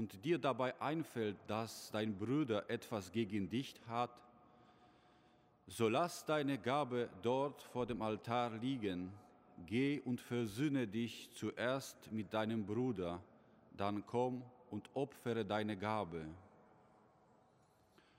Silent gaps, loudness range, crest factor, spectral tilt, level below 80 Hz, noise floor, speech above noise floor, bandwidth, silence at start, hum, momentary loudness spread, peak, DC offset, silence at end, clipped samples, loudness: none; 4 LU; 18 dB; -6 dB/octave; -74 dBFS; -72 dBFS; 31 dB; 16 kHz; 0 s; none; 8 LU; -22 dBFS; under 0.1%; 1.7 s; under 0.1%; -41 LUFS